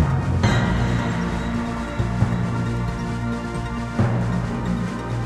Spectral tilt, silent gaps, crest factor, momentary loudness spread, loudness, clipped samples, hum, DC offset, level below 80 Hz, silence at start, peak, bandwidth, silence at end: -7 dB/octave; none; 16 dB; 6 LU; -23 LUFS; under 0.1%; none; under 0.1%; -32 dBFS; 0 s; -6 dBFS; 11 kHz; 0 s